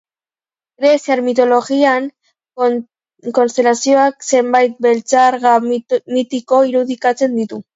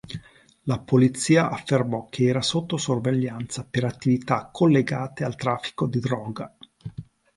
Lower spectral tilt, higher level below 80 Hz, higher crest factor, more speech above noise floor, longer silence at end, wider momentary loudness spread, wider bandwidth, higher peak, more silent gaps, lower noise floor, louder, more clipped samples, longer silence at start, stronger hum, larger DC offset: second, -3.5 dB/octave vs -6 dB/octave; second, -68 dBFS vs -58 dBFS; about the same, 14 dB vs 18 dB; first, over 76 dB vs 27 dB; second, 0.15 s vs 0.35 s; second, 7 LU vs 19 LU; second, 7.8 kHz vs 11.5 kHz; first, 0 dBFS vs -6 dBFS; neither; first, under -90 dBFS vs -50 dBFS; first, -14 LUFS vs -24 LUFS; neither; first, 0.8 s vs 0.05 s; neither; neither